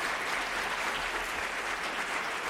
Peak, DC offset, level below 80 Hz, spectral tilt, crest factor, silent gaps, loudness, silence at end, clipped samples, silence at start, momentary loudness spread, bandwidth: -18 dBFS; under 0.1%; -56 dBFS; -1 dB/octave; 14 dB; none; -32 LUFS; 0 s; under 0.1%; 0 s; 2 LU; 16 kHz